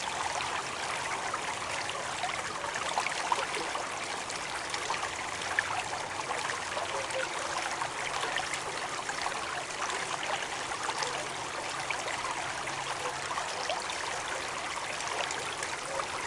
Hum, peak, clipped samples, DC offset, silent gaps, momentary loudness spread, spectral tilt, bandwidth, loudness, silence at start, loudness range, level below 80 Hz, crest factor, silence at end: none; -12 dBFS; under 0.1%; under 0.1%; none; 3 LU; -1 dB/octave; 11.5 kHz; -33 LUFS; 0 s; 1 LU; -64 dBFS; 22 dB; 0 s